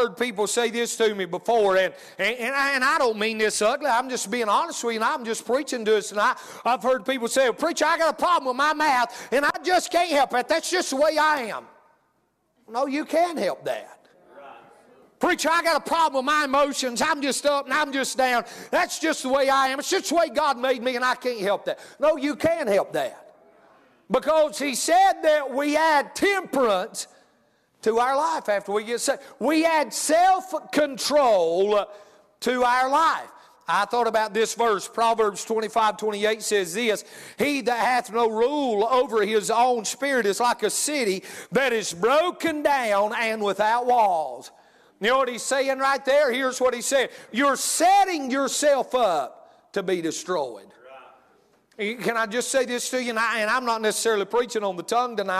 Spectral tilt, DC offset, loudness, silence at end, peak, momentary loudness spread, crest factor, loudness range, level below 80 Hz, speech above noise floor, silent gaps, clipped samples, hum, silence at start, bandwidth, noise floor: -2.5 dB/octave; under 0.1%; -23 LUFS; 0 s; -10 dBFS; 7 LU; 14 dB; 4 LU; -64 dBFS; 47 dB; none; under 0.1%; none; 0 s; 15 kHz; -69 dBFS